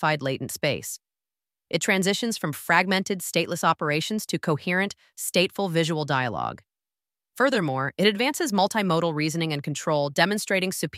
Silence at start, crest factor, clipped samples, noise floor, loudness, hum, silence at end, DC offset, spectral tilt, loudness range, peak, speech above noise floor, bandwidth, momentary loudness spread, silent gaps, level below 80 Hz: 0 s; 22 dB; under 0.1%; under -90 dBFS; -24 LUFS; none; 0 s; under 0.1%; -4 dB/octave; 2 LU; -4 dBFS; over 65 dB; 16 kHz; 7 LU; none; -66 dBFS